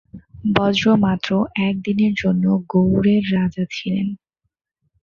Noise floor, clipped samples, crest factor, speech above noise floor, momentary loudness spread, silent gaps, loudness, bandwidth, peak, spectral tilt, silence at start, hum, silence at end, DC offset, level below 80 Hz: -76 dBFS; under 0.1%; 18 dB; 58 dB; 8 LU; none; -19 LUFS; 7 kHz; -2 dBFS; -7 dB/octave; 0.15 s; none; 0.9 s; under 0.1%; -48 dBFS